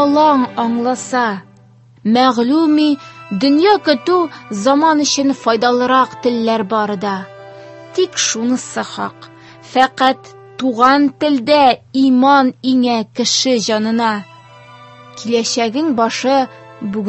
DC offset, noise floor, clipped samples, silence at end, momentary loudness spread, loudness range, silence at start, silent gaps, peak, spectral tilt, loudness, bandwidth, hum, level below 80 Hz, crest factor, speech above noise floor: under 0.1%; -45 dBFS; under 0.1%; 0 s; 12 LU; 5 LU; 0 s; none; 0 dBFS; -3.5 dB/octave; -14 LUFS; 8.6 kHz; none; -60 dBFS; 14 dB; 31 dB